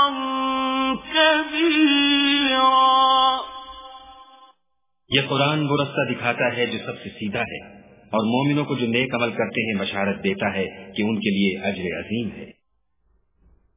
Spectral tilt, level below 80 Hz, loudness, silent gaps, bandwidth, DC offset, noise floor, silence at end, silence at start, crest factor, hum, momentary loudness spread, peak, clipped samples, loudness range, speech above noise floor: -9 dB/octave; -56 dBFS; -21 LUFS; none; 3.9 kHz; under 0.1%; -79 dBFS; 1.25 s; 0 s; 18 dB; none; 13 LU; -4 dBFS; under 0.1%; 7 LU; 56 dB